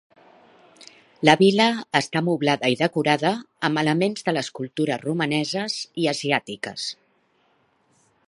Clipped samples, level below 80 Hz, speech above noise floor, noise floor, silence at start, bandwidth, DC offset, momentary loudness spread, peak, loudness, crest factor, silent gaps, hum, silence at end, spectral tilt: under 0.1%; -70 dBFS; 42 dB; -64 dBFS; 0.8 s; 11.5 kHz; under 0.1%; 12 LU; 0 dBFS; -22 LUFS; 24 dB; none; none; 1.35 s; -5 dB/octave